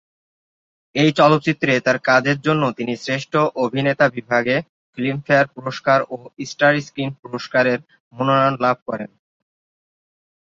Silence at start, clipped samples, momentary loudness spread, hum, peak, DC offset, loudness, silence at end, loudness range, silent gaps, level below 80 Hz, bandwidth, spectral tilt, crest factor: 0.95 s; under 0.1%; 11 LU; none; -2 dBFS; under 0.1%; -19 LUFS; 1.4 s; 3 LU; 4.69-4.93 s, 7.19-7.23 s, 8.00-8.11 s, 8.82-8.86 s; -62 dBFS; 7.8 kHz; -6 dB/octave; 18 dB